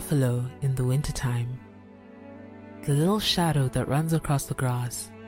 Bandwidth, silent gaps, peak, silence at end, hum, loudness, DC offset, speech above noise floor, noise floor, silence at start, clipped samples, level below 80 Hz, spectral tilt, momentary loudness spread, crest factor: 16 kHz; none; -12 dBFS; 0 s; none; -26 LUFS; under 0.1%; 22 dB; -48 dBFS; 0 s; under 0.1%; -46 dBFS; -5.5 dB/octave; 22 LU; 14 dB